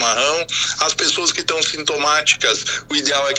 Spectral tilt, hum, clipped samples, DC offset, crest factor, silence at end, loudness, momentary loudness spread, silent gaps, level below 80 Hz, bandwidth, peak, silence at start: 0 dB/octave; none; under 0.1%; under 0.1%; 18 dB; 0 s; -16 LUFS; 4 LU; none; -56 dBFS; 15 kHz; 0 dBFS; 0 s